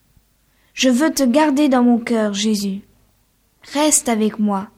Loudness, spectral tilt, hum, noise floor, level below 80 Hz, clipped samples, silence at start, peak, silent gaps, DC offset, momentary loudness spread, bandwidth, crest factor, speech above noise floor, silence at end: -17 LUFS; -3.5 dB/octave; none; -60 dBFS; -56 dBFS; under 0.1%; 0.75 s; -2 dBFS; none; under 0.1%; 10 LU; 16.5 kHz; 16 dB; 44 dB; 0.1 s